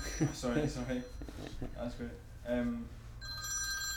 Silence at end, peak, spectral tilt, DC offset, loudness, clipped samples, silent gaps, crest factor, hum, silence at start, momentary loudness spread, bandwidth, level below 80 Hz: 0 s; -20 dBFS; -4 dB/octave; under 0.1%; -38 LUFS; under 0.1%; none; 18 dB; none; 0 s; 12 LU; 18.5 kHz; -48 dBFS